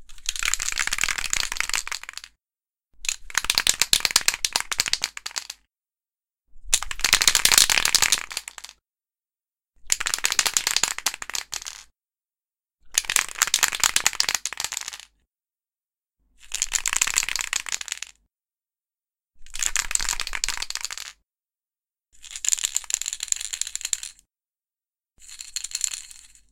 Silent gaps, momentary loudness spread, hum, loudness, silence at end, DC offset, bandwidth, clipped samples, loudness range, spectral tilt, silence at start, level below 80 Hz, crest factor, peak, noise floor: none; 16 LU; none; -22 LUFS; 0.25 s; under 0.1%; 17 kHz; under 0.1%; 8 LU; 2 dB/octave; 0 s; -46 dBFS; 28 dB; 0 dBFS; under -90 dBFS